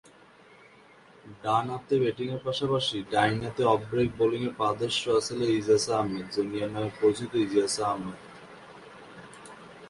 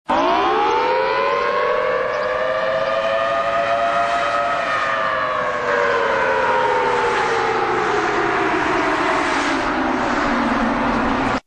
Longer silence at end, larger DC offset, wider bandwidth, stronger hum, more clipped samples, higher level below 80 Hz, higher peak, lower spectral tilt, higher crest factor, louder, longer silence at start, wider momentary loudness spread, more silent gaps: about the same, 0 s vs 0.05 s; neither; first, 11.5 kHz vs 10 kHz; neither; neither; second, -60 dBFS vs -44 dBFS; second, -8 dBFS vs -4 dBFS; about the same, -5 dB/octave vs -4.5 dB/octave; first, 22 dB vs 14 dB; second, -27 LUFS vs -18 LUFS; first, 1.25 s vs 0.1 s; first, 21 LU vs 2 LU; neither